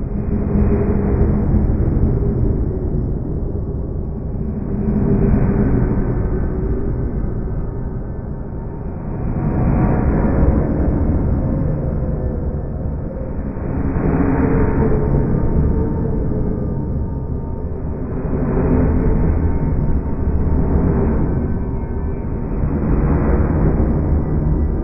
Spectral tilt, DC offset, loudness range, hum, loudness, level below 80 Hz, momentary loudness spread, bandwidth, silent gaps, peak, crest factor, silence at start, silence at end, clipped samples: -13.5 dB/octave; under 0.1%; 3 LU; none; -19 LUFS; -20 dBFS; 9 LU; 2.7 kHz; none; -2 dBFS; 14 dB; 0 s; 0 s; under 0.1%